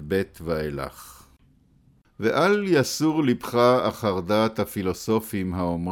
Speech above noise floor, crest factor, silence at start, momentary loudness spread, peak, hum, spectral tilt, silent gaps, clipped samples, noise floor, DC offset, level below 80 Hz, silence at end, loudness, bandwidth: 36 dB; 18 dB; 0 s; 9 LU; -6 dBFS; none; -5.5 dB/octave; none; under 0.1%; -59 dBFS; under 0.1%; -50 dBFS; 0 s; -24 LUFS; 18.5 kHz